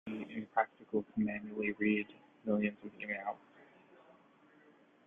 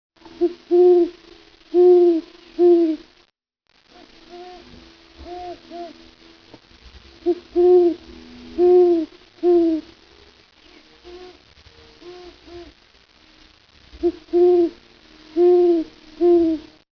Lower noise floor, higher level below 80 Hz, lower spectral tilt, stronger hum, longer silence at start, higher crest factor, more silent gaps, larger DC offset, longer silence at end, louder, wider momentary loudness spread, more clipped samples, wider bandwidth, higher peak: about the same, -65 dBFS vs -66 dBFS; second, -76 dBFS vs -54 dBFS; first, -9 dB/octave vs -7.5 dB/octave; neither; second, 0.05 s vs 0.4 s; first, 22 dB vs 14 dB; neither; neither; first, 0.95 s vs 0.35 s; second, -37 LUFS vs -18 LUFS; second, 11 LU vs 25 LU; neither; second, 3.8 kHz vs 5.4 kHz; second, -16 dBFS vs -6 dBFS